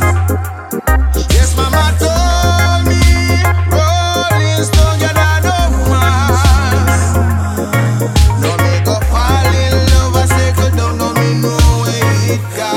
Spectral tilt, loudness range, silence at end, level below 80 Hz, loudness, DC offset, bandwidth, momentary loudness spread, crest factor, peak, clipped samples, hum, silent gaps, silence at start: -5 dB/octave; 1 LU; 0 s; -16 dBFS; -12 LUFS; under 0.1%; 16.5 kHz; 4 LU; 10 dB; 0 dBFS; under 0.1%; none; none; 0 s